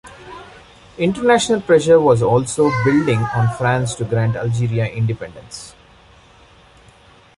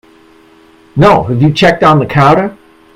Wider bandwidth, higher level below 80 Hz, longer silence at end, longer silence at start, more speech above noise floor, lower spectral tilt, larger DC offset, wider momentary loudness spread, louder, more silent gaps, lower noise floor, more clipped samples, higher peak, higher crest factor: about the same, 11.5 kHz vs 11.5 kHz; second, -46 dBFS vs -38 dBFS; first, 1.7 s vs 0.45 s; second, 0.05 s vs 0.95 s; about the same, 32 dB vs 35 dB; about the same, -6 dB/octave vs -7 dB/octave; neither; first, 21 LU vs 6 LU; second, -16 LUFS vs -8 LUFS; neither; first, -48 dBFS vs -42 dBFS; second, under 0.1% vs 0.4%; about the same, -2 dBFS vs 0 dBFS; first, 16 dB vs 10 dB